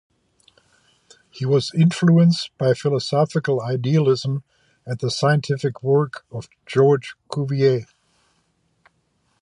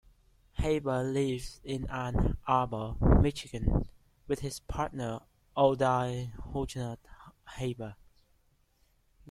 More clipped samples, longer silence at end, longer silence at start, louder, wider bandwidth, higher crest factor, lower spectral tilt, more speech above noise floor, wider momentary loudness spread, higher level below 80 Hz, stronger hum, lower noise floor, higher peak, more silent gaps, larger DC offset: neither; first, 1.55 s vs 1.35 s; first, 1.35 s vs 0.55 s; first, -20 LUFS vs -32 LUFS; second, 11 kHz vs 14 kHz; second, 16 dB vs 24 dB; about the same, -7 dB/octave vs -7 dB/octave; first, 47 dB vs 39 dB; about the same, 12 LU vs 14 LU; second, -62 dBFS vs -38 dBFS; neither; about the same, -67 dBFS vs -69 dBFS; first, -4 dBFS vs -8 dBFS; neither; neither